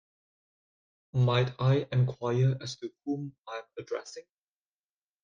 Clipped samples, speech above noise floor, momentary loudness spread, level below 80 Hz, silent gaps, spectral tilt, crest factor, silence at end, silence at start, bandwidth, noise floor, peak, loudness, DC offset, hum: under 0.1%; over 61 dB; 14 LU; -66 dBFS; 3.38-3.44 s; -7 dB/octave; 18 dB; 1.05 s; 1.15 s; 7.4 kHz; under -90 dBFS; -12 dBFS; -30 LUFS; under 0.1%; none